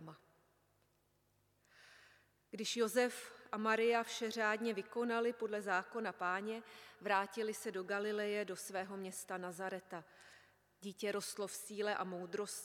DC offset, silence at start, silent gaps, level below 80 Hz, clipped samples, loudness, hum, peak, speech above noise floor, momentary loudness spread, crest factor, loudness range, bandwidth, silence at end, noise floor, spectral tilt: under 0.1%; 0 s; none; -90 dBFS; under 0.1%; -40 LUFS; 50 Hz at -80 dBFS; -20 dBFS; 38 dB; 13 LU; 22 dB; 7 LU; 17 kHz; 0 s; -78 dBFS; -3 dB/octave